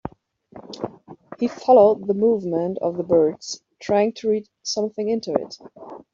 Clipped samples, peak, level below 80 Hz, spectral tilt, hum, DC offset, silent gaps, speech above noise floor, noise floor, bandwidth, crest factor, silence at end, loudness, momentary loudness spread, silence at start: under 0.1%; -4 dBFS; -60 dBFS; -5.5 dB/octave; none; under 0.1%; none; 29 dB; -49 dBFS; 7.6 kHz; 18 dB; 0.15 s; -21 LUFS; 21 LU; 0.05 s